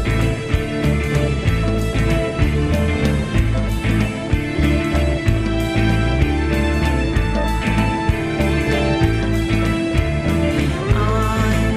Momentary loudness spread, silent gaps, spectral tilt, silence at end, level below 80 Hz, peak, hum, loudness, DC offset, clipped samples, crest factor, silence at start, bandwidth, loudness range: 2 LU; none; -6.5 dB/octave; 0 s; -22 dBFS; -2 dBFS; none; -18 LUFS; under 0.1%; under 0.1%; 14 dB; 0 s; 15.5 kHz; 1 LU